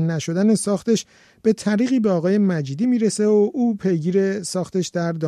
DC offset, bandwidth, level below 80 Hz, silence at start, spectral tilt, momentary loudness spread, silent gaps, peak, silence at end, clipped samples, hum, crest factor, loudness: under 0.1%; 13 kHz; -64 dBFS; 0 s; -6 dB/octave; 6 LU; none; -6 dBFS; 0 s; under 0.1%; none; 12 dB; -20 LUFS